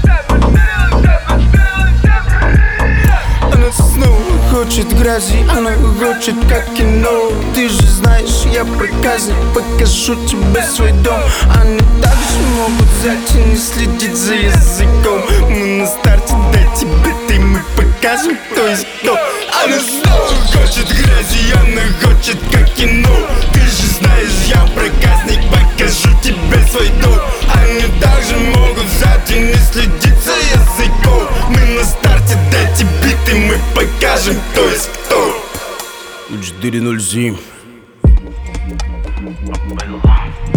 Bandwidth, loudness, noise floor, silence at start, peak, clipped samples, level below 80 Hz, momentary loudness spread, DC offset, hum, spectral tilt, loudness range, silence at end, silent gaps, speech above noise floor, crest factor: 19.5 kHz; -12 LUFS; -37 dBFS; 0 s; 0 dBFS; under 0.1%; -12 dBFS; 4 LU; under 0.1%; none; -4.5 dB/octave; 4 LU; 0 s; none; 27 dB; 10 dB